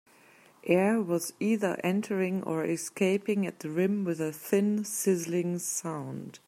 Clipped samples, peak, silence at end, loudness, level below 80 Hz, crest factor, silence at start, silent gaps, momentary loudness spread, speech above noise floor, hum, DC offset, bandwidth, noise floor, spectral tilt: under 0.1%; -10 dBFS; 0.1 s; -29 LUFS; -78 dBFS; 18 dB; 0.65 s; none; 6 LU; 30 dB; none; under 0.1%; 16 kHz; -59 dBFS; -5.5 dB/octave